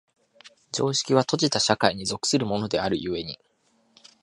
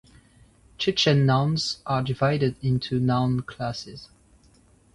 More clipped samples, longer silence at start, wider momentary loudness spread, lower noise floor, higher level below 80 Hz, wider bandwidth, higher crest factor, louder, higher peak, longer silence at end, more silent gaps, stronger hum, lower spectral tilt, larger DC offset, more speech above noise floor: neither; second, 0.45 s vs 0.8 s; about the same, 11 LU vs 12 LU; first, -66 dBFS vs -58 dBFS; about the same, -56 dBFS vs -52 dBFS; about the same, 11.5 kHz vs 11.5 kHz; first, 24 dB vs 18 dB; about the same, -24 LUFS vs -24 LUFS; first, -2 dBFS vs -8 dBFS; about the same, 0.85 s vs 0.9 s; neither; neither; second, -3.5 dB/octave vs -6 dB/octave; neither; first, 42 dB vs 34 dB